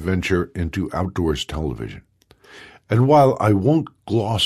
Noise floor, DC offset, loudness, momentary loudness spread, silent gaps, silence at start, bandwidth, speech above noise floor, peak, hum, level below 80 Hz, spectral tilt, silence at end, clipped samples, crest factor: -49 dBFS; under 0.1%; -20 LUFS; 12 LU; none; 0 s; 14 kHz; 30 dB; -4 dBFS; none; -36 dBFS; -6.5 dB/octave; 0 s; under 0.1%; 16 dB